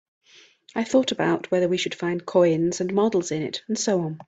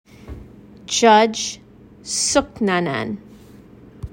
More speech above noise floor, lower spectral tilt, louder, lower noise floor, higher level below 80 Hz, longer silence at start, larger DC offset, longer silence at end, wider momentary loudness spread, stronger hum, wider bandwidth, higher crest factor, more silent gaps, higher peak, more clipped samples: first, 30 dB vs 26 dB; first, -5 dB/octave vs -3 dB/octave; second, -23 LUFS vs -18 LUFS; first, -53 dBFS vs -44 dBFS; second, -66 dBFS vs -46 dBFS; first, 0.75 s vs 0.25 s; neither; about the same, 0.05 s vs 0.05 s; second, 8 LU vs 26 LU; neither; second, 8.8 kHz vs 16.5 kHz; about the same, 18 dB vs 20 dB; neither; second, -6 dBFS vs -2 dBFS; neither